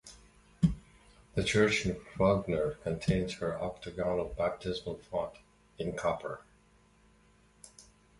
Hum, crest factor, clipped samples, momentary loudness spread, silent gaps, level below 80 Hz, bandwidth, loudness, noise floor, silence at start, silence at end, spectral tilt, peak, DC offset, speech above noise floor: none; 22 dB; under 0.1%; 15 LU; none; -50 dBFS; 11.5 kHz; -33 LUFS; -64 dBFS; 0.05 s; 0.4 s; -5.5 dB/octave; -12 dBFS; under 0.1%; 32 dB